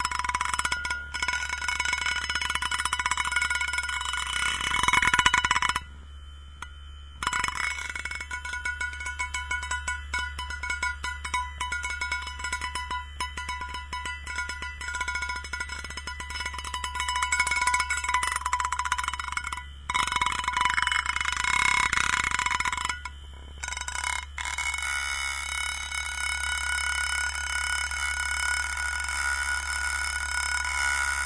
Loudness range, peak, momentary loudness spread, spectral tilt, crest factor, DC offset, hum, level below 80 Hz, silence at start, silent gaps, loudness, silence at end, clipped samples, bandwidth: 7 LU; -4 dBFS; 10 LU; -0.5 dB/octave; 26 dB; 0.2%; none; -42 dBFS; 0 s; none; -27 LUFS; 0 s; under 0.1%; 11 kHz